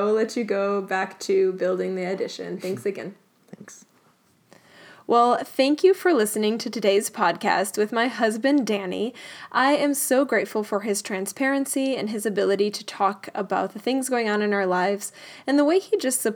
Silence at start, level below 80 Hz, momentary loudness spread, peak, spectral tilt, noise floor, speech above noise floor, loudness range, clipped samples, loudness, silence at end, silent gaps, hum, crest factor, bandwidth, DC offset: 0 s; -86 dBFS; 10 LU; -6 dBFS; -4 dB/octave; -61 dBFS; 38 dB; 6 LU; under 0.1%; -23 LUFS; 0 s; none; none; 18 dB; over 20 kHz; under 0.1%